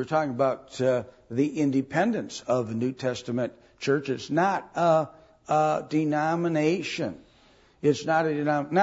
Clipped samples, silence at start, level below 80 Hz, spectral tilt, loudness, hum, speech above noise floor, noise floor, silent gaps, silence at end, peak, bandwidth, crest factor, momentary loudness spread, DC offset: under 0.1%; 0 s; -66 dBFS; -6 dB/octave; -26 LUFS; none; 33 dB; -58 dBFS; none; 0 s; -10 dBFS; 8 kHz; 18 dB; 7 LU; under 0.1%